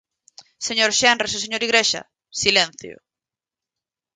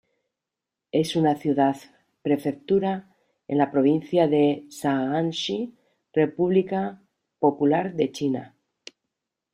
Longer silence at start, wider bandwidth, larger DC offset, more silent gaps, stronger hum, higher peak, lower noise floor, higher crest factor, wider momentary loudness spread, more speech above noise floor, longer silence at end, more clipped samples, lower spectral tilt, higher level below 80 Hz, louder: second, 0.6 s vs 0.95 s; second, 10.5 kHz vs 14.5 kHz; neither; neither; neither; first, 0 dBFS vs -6 dBFS; about the same, -89 dBFS vs -87 dBFS; about the same, 22 dB vs 18 dB; first, 13 LU vs 8 LU; first, 69 dB vs 64 dB; first, 1.25 s vs 1.05 s; neither; second, -0.5 dB/octave vs -6.5 dB/octave; first, -60 dBFS vs -66 dBFS; first, -18 LUFS vs -24 LUFS